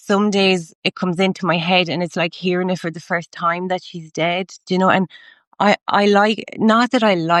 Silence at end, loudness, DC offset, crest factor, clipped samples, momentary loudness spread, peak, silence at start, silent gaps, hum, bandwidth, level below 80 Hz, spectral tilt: 0 s; -18 LUFS; under 0.1%; 16 dB; under 0.1%; 9 LU; -2 dBFS; 0.05 s; 0.75-0.82 s, 5.47-5.51 s; none; 11.5 kHz; -68 dBFS; -5.5 dB/octave